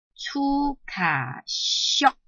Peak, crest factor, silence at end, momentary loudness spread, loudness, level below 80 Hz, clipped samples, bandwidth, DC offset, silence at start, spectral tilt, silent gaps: -6 dBFS; 20 dB; 0.15 s; 9 LU; -24 LUFS; -48 dBFS; under 0.1%; 8.2 kHz; under 0.1%; 0.2 s; -2.5 dB/octave; none